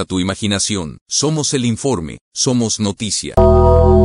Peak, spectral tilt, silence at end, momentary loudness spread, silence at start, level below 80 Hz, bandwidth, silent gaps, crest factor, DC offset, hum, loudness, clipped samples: 0 dBFS; -5 dB/octave; 0 s; 9 LU; 0 s; -26 dBFS; 11 kHz; 1.01-1.06 s, 2.21-2.32 s; 14 dB; under 0.1%; none; -15 LUFS; under 0.1%